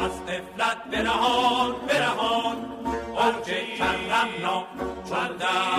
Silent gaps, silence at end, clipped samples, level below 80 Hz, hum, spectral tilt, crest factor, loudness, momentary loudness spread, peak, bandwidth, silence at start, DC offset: none; 0 s; under 0.1%; -50 dBFS; none; -3.5 dB/octave; 16 dB; -25 LUFS; 9 LU; -8 dBFS; 15.5 kHz; 0 s; under 0.1%